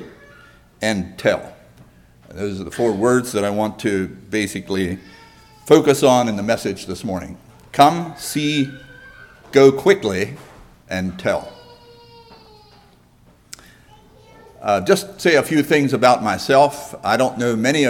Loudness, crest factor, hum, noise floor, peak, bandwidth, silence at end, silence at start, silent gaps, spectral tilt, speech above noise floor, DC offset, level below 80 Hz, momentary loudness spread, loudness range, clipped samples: -18 LUFS; 20 dB; none; -52 dBFS; 0 dBFS; 17.5 kHz; 0 s; 0 s; none; -5 dB/octave; 34 dB; under 0.1%; -52 dBFS; 14 LU; 11 LU; under 0.1%